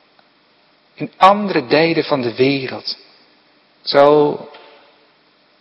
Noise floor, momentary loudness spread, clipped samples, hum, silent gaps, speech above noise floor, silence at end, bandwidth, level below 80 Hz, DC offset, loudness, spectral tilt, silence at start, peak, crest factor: -55 dBFS; 18 LU; under 0.1%; none; none; 40 dB; 1.05 s; 9 kHz; -62 dBFS; under 0.1%; -15 LUFS; -7 dB/octave; 1 s; 0 dBFS; 18 dB